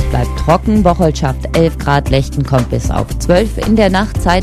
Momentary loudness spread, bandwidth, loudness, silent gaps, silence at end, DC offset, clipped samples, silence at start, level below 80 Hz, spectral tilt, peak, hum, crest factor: 5 LU; 14 kHz; -13 LUFS; none; 0 s; under 0.1%; 0.2%; 0 s; -20 dBFS; -6.5 dB/octave; 0 dBFS; none; 12 dB